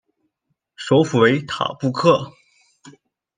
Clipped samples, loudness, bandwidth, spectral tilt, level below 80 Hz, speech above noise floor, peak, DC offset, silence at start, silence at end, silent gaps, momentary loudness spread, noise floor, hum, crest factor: under 0.1%; -18 LUFS; 9.6 kHz; -6 dB/octave; -62 dBFS; 57 dB; -2 dBFS; under 0.1%; 0.8 s; 1.05 s; none; 12 LU; -74 dBFS; none; 18 dB